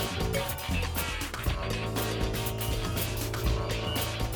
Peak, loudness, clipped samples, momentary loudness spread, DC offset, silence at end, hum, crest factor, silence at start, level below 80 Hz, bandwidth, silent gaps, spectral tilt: -16 dBFS; -31 LUFS; under 0.1%; 2 LU; under 0.1%; 0 s; none; 14 dB; 0 s; -36 dBFS; over 20 kHz; none; -4.5 dB/octave